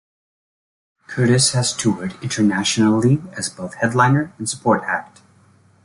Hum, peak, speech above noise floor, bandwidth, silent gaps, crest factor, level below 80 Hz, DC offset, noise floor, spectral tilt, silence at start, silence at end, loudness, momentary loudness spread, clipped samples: none; -2 dBFS; 35 dB; 11.5 kHz; none; 18 dB; -54 dBFS; under 0.1%; -53 dBFS; -4.5 dB/octave; 1.1 s; 0.8 s; -18 LUFS; 11 LU; under 0.1%